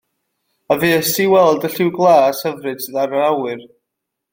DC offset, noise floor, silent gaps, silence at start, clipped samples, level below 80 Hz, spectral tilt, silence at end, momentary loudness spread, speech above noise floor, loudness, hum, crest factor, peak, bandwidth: under 0.1%; -79 dBFS; none; 0.7 s; under 0.1%; -60 dBFS; -4.5 dB/octave; 0.65 s; 11 LU; 63 dB; -15 LUFS; none; 16 dB; 0 dBFS; 17 kHz